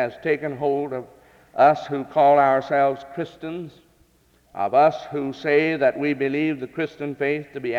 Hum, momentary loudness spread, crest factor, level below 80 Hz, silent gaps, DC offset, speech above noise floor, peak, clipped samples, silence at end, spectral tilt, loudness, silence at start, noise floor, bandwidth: none; 15 LU; 18 dB; -64 dBFS; none; under 0.1%; 38 dB; -4 dBFS; under 0.1%; 0 s; -7 dB/octave; -21 LUFS; 0 s; -60 dBFS; 7.4 kHz